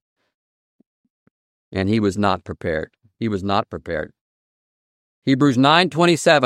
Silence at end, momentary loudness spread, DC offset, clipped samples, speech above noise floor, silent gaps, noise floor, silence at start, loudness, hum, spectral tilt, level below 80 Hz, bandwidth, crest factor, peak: 0 s; 14 LU; under 0.1%; under 0.1%; over 72 dB; 4.21-5.22 s; under -90 dBFS; 1.7 s; -19 LUFS; none; -5.5 dB/octave; -52 dBFS; 13.5 kHz; 20 dB; 0 dBFS